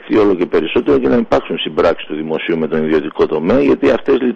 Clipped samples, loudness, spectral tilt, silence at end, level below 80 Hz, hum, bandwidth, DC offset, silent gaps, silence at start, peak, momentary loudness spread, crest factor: under 0.1%; -14 LUFS; -7 dB/octave; 0 s; -40 dBFS; none; 7.2 kHz; under 0.1%; none; 0 s; -2 dBFS; 5 LU; 12 dB